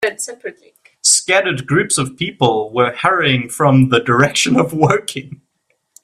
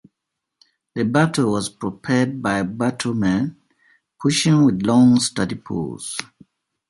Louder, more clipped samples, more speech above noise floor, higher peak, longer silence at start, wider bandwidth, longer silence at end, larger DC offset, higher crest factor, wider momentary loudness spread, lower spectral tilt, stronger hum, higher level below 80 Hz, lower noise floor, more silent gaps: first, -14 LUFS vs -20 LUFS; neither; second, 51 dB vs 62 dB; first, 0 dBFS vs -4 dBFS; second, 0 s vs 0.95 s; first, 14 kHz vs 11.5 kHz; about the same, 0.7 s vs 0.65 s; neither; about the same, 16 dB vs 18 dB; about the same, 13 LU vs 13 LU; second, -4 dB/octave vs -5.5 dB/octave; neither; about the same, -52 dBFS vs -52 dBFS; second, -66 dBFS vs -81 dBFS; neither